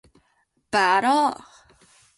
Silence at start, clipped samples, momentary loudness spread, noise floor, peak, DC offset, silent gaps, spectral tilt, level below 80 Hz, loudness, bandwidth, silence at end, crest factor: 0.75 s; under 0.1%; 9 LU; -68 dBFS; -6 dBFS; under 0.1%; none; -3 dB/octave; -64 dBFS; -21 LUFS; 11.5 kHz; 0.85 s; 18 dB